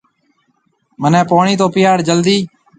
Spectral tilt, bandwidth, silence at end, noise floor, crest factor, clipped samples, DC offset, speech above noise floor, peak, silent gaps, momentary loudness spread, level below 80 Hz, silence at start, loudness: -5.5 dB/octave; 9.4 kHz; 0.3 s; -61 dBFS; 14 dB; under 0.1%; under 0.1%; 50 dB; 0 dBFS; none; 4 LU; -56 dBFS; 1 s; -13 LUFS